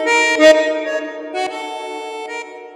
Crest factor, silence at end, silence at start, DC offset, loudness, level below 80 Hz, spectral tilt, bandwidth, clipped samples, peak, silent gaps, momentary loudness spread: 16 dB; 0 s; 0 s; under 0.1%; -15 LUFS; -64 dBFS; -1 dB/octave; 12.5 kHz; under 0.1%; 0 dBFS; none; 17 LU